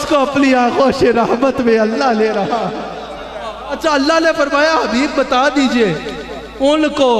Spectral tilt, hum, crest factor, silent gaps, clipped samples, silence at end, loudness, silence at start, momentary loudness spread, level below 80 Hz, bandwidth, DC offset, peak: -4.5 dB/octave; none; 14 dB; none; under 0.1%; 0 s; -14 LUFS; 0 s; 14 LU; -42 dBFS; 13 kHz; under 0.1%; 0 dBFS